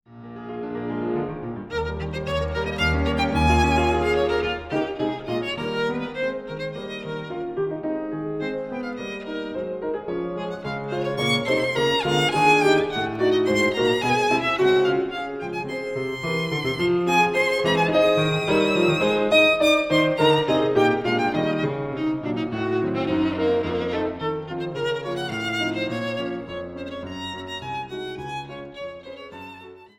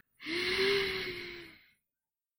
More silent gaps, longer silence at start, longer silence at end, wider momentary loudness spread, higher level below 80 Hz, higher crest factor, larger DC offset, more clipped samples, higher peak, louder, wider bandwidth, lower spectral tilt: neither; about the same, 0.1 s vs 0.2 s; second, 0.1 s vs 0.85 s; second, 13 LU vs 18 LU; first, -40 dBFS vs -62 dBFS; about the same, 18 dB vs 18 dB; neither; neither; first, -6 dBFS vs -18 dBFS; first, -23 LUFS vs -32 LUFS; about the same, 17 kHz vs 16.5 kHz; first, -5.5 dB/octave vs -3 dB/octave